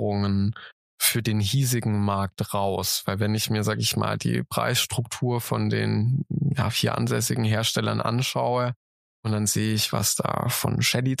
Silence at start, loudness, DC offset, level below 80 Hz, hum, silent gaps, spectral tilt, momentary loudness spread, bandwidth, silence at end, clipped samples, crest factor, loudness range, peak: 0 s; -24 LUFS; under 0.1%; -56 dBFS; none; 0.73-0.98 s, 8.76-9.23 s; -4.5 dB/octave; 4 LU; 15.5 kHz; 0.05 s; under 0.1%; 18 dB; 1 LU; -6 dBFS